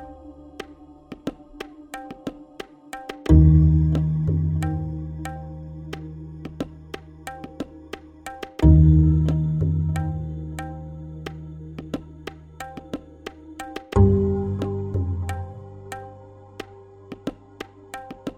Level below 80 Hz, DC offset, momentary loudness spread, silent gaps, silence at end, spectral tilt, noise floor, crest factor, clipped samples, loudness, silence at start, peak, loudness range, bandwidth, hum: -30 dBFS; under 0.1%; 23 LU; none; 0.05 s; -8.5 dB/octave; -46 dBFS; 22 dB; under 0.1%; -21 LUFS; 0 s; -2 dBFS; 15 LU; 10 kHz; none